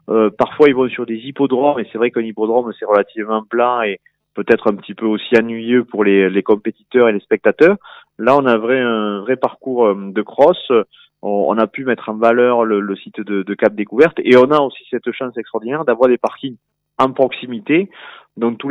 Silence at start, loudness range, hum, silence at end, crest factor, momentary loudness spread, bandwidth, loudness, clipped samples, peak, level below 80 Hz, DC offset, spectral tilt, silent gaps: 0.1 s; 3 LU; none; 0 s; 16 dB; 11 LU; 7 kHz; -16 LUFS; under 0.1%; 0 dBFS; -62 dBFS; under 0.1%; -7.5 dB/octave; none